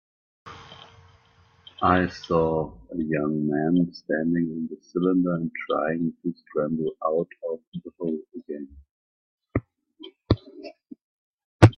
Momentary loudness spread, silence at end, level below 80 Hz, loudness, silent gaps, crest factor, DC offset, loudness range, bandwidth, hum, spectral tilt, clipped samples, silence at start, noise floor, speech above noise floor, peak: 21 LU; 0.05 s; -50 dBFS; -26 LUFS; 7.67-7.72 s, 8.91-9.38 s, 11.02-11.38 s, 11.44-11.59 s; 26 dB; under 0.1%; 8 LU; 9.6 kHz; none; -8 dB/octave; under 0.1%; 0.45 s; -59 dBFS; 33 dB; 0 dBFS